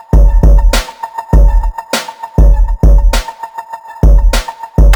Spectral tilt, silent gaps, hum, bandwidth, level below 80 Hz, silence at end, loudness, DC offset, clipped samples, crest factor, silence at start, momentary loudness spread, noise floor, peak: -5.5 dB/octave; none; none; 19 kHz; -8 dBFS; 0 s; -12 LUFS; under 0.1%; under 0.1%; 8 dB; 0.15 s; 14 LU; -26 dBFS; 0 dBFS